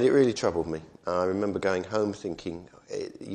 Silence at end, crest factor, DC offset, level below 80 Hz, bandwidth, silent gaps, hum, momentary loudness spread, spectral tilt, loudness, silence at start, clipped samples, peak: 0 s; 18 dB; under 0.1%; -58 dBFS; 9.6 kHz; none; none; 13 LU; -6 dB/octave; -29 LUFS; 0 s; under 0.1%; -10 dBFS